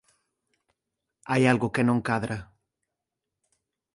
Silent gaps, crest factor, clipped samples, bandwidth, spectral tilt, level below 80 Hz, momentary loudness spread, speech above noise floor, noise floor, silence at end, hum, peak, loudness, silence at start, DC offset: none; 24 dB; under 0.1%; 11.5 kHz; -6.5 dB/octave; -60 dBFS; 11 LU; 62 dB; -86 dBFS; 1.5 s; none; -6 dBFS; -25 LUFS; 1.25 s; under 0.1%